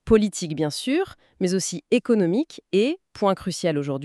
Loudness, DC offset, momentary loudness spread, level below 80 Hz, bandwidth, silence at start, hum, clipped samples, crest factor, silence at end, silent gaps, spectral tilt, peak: -24 LUFS; under 0.1%; 6 LU; -48 dBFS; 13 kHz; 0.05 s; none; under 0.1%; 16 dB; 0 s; none; -5 dB/octave; -6 dBFS